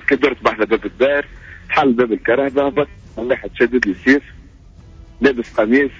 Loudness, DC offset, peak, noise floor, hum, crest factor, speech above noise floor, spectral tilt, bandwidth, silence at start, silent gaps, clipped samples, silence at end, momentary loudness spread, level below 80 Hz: -17 LUFS; under 0.1%; -2 dBFS; -42 dBFS; none; 16 dB; 26 dB; -6 dB/octave; 7.6 kHz; 0.1 s; none; under 0.1%; 0 s; 7 LU; -42 dBFS